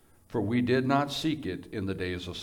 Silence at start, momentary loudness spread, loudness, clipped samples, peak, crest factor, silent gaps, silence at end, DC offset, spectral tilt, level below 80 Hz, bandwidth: 0.3 s; 10 LU; -30 LUFS; under 0.1%; -12 dBFS; 18 dB; none; 0 s; under 0.1%; -6 dB/octave; -58 dBFS; 18 kHz